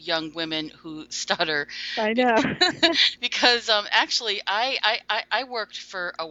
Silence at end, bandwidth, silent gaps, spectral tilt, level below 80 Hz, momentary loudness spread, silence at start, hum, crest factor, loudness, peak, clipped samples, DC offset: 0 s; 8.2 kHz; none; -2 dB/octave; -64 dBFS; 13 LU; 0 s; 60 Hz at -55 dBFS; 22 dB; -22 LUFS; -2 dBFS; under 0.1%; under 0.1%